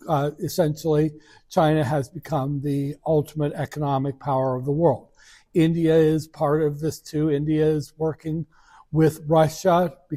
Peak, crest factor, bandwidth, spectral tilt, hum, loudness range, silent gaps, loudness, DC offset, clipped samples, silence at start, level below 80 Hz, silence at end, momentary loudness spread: -6 dBFS; 16 dB; 15.5 kHz; -7.5 dB/octave; none; 2 LU; none; -23 LUFS; under 0.1%; under 0.1%; 0.05 s; -52 dBFS; 0 s; 8 LU